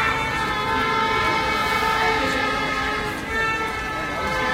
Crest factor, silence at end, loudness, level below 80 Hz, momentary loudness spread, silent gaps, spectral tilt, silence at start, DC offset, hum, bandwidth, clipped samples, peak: 14 dB; 0 s; -21 LUFS; -40 dBFS; 5 LU; none; -3.5 dB/octave; 0 s; under 0.1%; none; 16 kHz; under 0.1%; -8 dBFS